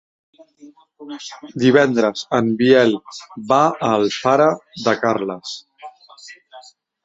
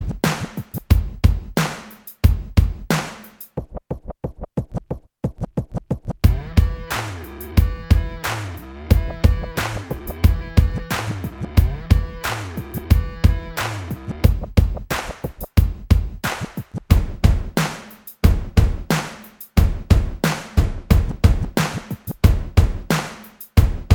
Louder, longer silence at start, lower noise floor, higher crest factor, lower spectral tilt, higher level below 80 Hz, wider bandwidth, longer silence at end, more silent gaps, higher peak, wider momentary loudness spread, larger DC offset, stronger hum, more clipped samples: first, -17 LUFS vs -21 LUFS; first, 0.65 s vs 0 s; first, -45 dBFS vs -39 dBFS; about the same, 18 dB vs 20 dB; about the same, -5.5 dB/octave vs -6 dB/octave; second, -60 dBFS vs -22 dBFS; second, 8 kHz vs over 20 kHz; first, 0.45 s vs 0 s; neither; about the same, 0 dBFS vs 0 dBFS; first, 19 LU vs 14 LU; neither; neither; neither